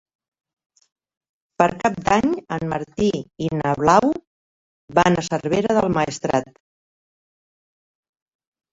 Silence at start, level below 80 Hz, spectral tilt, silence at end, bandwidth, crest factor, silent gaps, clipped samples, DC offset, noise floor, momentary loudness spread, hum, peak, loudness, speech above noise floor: 1.6 s; -50 dBFS; -5.5 dB/octave; 2.3 s; 8 kHz; 20 dB; 4.27-4.88 s; under 0.1%; under 0.1%; under -90 dBFS; 9 LU; none; -2 dBFS; -20 LUFS; over 70 dB